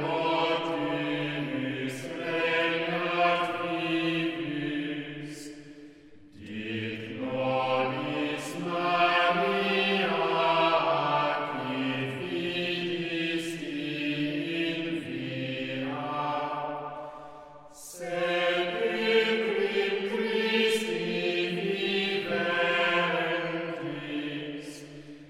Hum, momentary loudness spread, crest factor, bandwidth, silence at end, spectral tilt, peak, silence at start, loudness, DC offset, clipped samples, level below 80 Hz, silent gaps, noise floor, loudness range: none; 13 LU; 18 dB; 15.5 kHz; 0 s; -5 dB/octave; -10 dBFS; 0 s; -28 LUFS; under 0.1%; under 0.1%; -68 dBFS; none; -51 dBFS; 7 LU